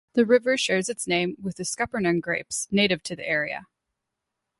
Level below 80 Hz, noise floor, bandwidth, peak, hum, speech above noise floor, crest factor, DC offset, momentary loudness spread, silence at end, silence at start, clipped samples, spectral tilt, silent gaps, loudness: -62 dBFS; -83 dBFS; 12 kHz; -6 dBFS; none; 59 dB; 18 dB; under 0.1%; 9 LU; 0.95 s; 0.15 s; under 0.1%; -3.5 dB/octave; none; -24 LUFS